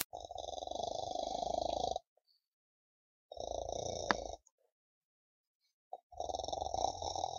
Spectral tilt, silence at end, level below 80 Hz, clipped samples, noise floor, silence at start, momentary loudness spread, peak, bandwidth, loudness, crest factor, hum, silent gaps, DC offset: -3 dB/octave; 0 s; -60 dBFS; under 0.1%; under -90 dBFS; 0 s; 13 LU; -6 dBFS; 15.5 kHz; -40 LUFS; 36 dB; none; 0.05-0.10 s, 2.07-2.16 s, 2.48-3.29 s, 4.52-4.58 s, 4.72-5.60 s, 5.73-5.91 s, 6.03-6.10 s; under 0.1%